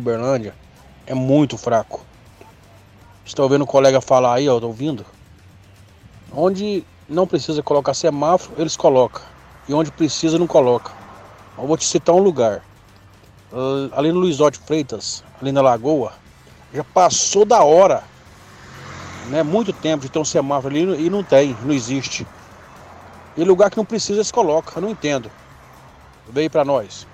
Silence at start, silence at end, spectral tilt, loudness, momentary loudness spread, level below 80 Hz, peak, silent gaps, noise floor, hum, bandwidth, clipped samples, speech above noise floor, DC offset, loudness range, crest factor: 0 s; 0.1 s; -5 dB/octave; -18 LUFS; 15 LU; -52 dBFS; -2 dBFS; none; -47 dBFS; none; 10 kHz; under 0.1%; 30 dB; under 0.1%; 5 LU; 16 dB